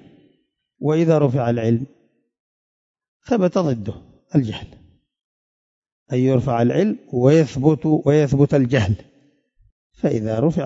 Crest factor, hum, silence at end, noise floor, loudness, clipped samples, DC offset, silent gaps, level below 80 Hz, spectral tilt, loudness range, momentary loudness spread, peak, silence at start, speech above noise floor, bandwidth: 18 dB; none; 0 s; -66 dBFS; -19 LUFS; under 0.1%; under 0.1%; 2.40-2.94 s, 3.08-3.20 s, 5.24-5.82 s, 5.92-6.06 s, 9.72-9.90 s; -50 dBFS; -8 dB/octave; 7 LU; 10 LU; -2 dBFS; 0.8 s; 48 dB; 7.8 kHz